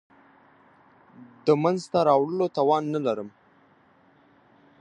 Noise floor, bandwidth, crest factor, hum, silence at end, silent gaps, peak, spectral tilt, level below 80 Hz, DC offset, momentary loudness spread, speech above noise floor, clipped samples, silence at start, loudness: -59 dBFS; 10 kHz; 20 dB; none; 1.5 s; none; -8 dBFS; -7 dB/octave; -72 dBFS; under 0.1%; 8 LU; 36 dB; under 0.1%; 1.2 s; -24 LUFS